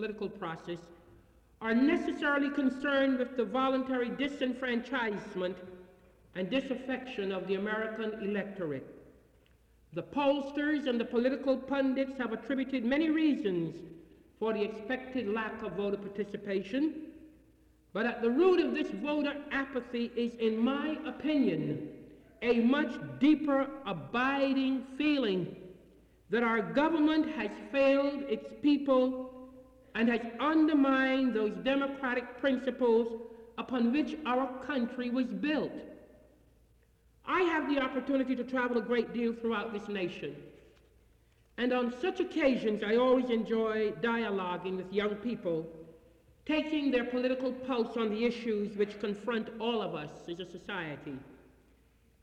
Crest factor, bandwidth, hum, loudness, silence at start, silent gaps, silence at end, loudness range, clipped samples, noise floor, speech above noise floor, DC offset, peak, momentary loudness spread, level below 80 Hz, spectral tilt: 16 dB; 8.4 kHz; none; -32 LUFS; 0 s; none; 0.85 s; 6 LU; under 0.1%; -66 dBFS; 34 dB; under 0.1%; -16 dBFS; 12 LU; -66 dBFS; -6.5 dB/octave